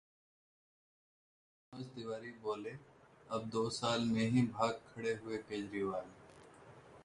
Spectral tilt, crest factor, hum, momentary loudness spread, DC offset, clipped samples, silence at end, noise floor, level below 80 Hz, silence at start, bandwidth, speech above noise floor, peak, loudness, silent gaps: -5.5 dB/octave; 20 dB; none; 25 LU; under 0.1%; under 0.1%; 0 s; -59 dBFS; -72 dBFS; 1.7 s; 11 kHz; 21 dB; -20 dBFS; -38 LUFS; none